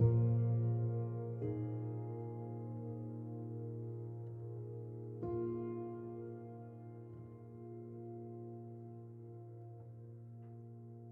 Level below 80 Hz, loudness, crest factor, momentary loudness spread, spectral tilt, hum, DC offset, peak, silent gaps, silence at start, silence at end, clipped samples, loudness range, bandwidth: -68 dBFS; -43 LUFS; 22 dB; 17 LU; -13.5 dB/octave; none; under 0.1%; -20 dBFS; none; 0 s; 0 s; under 0.1%; 11 LU; 2.2 kHz